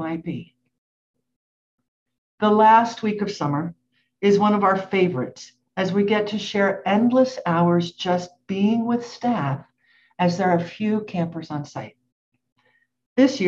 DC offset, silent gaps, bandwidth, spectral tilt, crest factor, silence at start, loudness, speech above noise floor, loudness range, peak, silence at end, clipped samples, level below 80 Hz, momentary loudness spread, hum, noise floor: under 0.1%; 0.78-1.14 s, 1.36-1.78 s, 1.88-2.06 s, 2.18-2.38 s, 12.12-12.32 s, 12.52-12.56 s, 13.06-13.16 s; 7.6 kHz; -6.5 dB/octave; 18 dB; 0 s; -21 LUFS; 45 dB; 5 LU; -4 dBFS; 0 s; under 0.1%; -66 dBFS; 14 LU; none; -65 dBFS